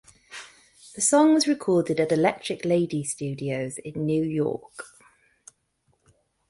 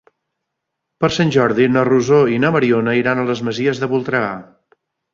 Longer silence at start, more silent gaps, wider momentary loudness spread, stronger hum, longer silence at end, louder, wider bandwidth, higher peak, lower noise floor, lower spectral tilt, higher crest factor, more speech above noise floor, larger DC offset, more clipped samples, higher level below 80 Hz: second, 0.3 s vs 1 s; neither; first, 23 LU vs 7 LU; neither; first, 1.65 s vs 0.7 s; second, -24 LUFS vs -16 LUFS; first, 11.5 kHz vs 7.4 kHz; second, -8 dBFS vs -2 dBFS; second, -70 dBFS vs -77 dBFS; second, -4.5 dB/octave vs -6.5 dB/octave; about the same, 18 dB vs 16 dB; second, 46 dB vs 62 dB; neither; neither; second, -64 dBFS vs -54 dBFS